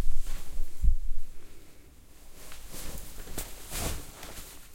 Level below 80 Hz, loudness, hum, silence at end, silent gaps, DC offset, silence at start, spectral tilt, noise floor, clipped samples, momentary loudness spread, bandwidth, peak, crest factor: -32 dBFS; -38 LUFS; none; 0 s; none; under 0.1%; 0 s; -3.5 dB/octave; -50 dBFS; under 0.1%; 22 LU; 16.5 kHz; -8 dBFS; 18 dB